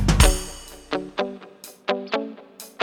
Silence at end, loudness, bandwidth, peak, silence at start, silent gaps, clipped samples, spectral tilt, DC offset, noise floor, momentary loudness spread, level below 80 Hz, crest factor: 0 s; -25 LUFS; 19 kHz; 0 dBFS; 0 s; none; under 0.1%; -4 dB/octave; under 0.1%; -44 dBFS; 22 LU; -28 dBFS; 24 dB